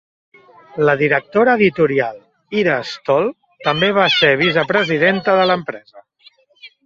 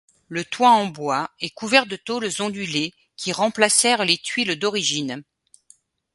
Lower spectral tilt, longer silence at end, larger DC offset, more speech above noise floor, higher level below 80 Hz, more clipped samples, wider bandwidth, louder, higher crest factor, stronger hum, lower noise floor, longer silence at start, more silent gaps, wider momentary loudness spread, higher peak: first, -6 dB/octave vs -2 dB/octave; second, 0.2 s vs 0.95 s; neither; about the same, 36 dB vs 35 dB; first, -58 dBFS vs -68 dBFS; neither; second, 7.4 kHz vs 12 kHz; first, -15 LUFS vs -21 LUFS; second, 16 dB vs 22 dB; neither; second, -51 dBFS vs -57 dBFS; first, 0.75 s vs 0.3 s; neither; about the same, 11 LU vs 13 LU; about the same, -2 dBFS vs 0 dBFS